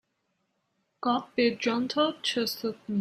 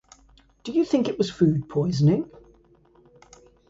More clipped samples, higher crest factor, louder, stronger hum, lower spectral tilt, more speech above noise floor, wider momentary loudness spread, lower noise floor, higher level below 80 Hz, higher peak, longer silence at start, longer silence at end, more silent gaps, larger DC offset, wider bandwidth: neither; about the same, 18 dB vs 18 dB; second, -28 LUFS vs -23 LUFS; neither; second, -4 dB/octave vs -8 dB/octave; first, 49 dB vs 35 dB; about the same, 6 LU vs 7 LU; first, -77 dBFS vs -57 dBFS; second, -74 dBFS vs -56 dBFS; second, -12 dBFS vs -8 dBFS; first, 1 s vs 0.65 s; second, 0 s vs 1.45 s; neither; neither; first, 16 kHz vs 7.8 kHz